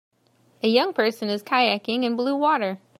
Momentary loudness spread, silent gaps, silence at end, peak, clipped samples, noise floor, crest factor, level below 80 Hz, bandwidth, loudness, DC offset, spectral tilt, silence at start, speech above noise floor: 4 LU; none; 0.2 s; -4 dBFS; under 0.1%; -61 dBFS; 18 dB; -80 dBFS; 15.5 kHz; -22 LUFS; under 0.1%; -5 dB/octave; 0.65 s; 39 dB